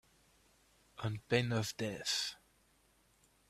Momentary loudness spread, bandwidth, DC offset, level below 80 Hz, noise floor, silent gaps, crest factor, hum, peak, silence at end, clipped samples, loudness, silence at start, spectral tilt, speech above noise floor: 14 LU; 15 kHz; under 0.1%; -70 dBFS; -71 dBFS; none; 24 dB; none; -16 dBFS; 1.15 s; under 0.1%; -37 LUFS; 0.95 s; -4 dB/octave; 35 dB